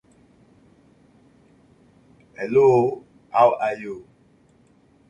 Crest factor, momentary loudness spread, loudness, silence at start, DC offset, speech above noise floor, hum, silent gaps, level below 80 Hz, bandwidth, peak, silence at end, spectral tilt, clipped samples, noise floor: 20 dB; 20 LU; -20 LUFS; 2.4 s; under 0.1%; 38 dB; none; none; -64 dBFS; 7.2 kHz; -4 dBFS; 1.1 s; -7.5 dB/octave; under 0.1%; -57 dBFS